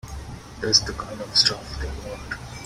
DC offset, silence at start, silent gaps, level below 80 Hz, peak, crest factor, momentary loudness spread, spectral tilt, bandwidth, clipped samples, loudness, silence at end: under 0.1%; 0.05 s; none; -38 dBFS; -2 dBFS; 24 dB; 19 LU; -2 dB/octave; 16 kHz; under 0.1%; -21 LUFS; 0 s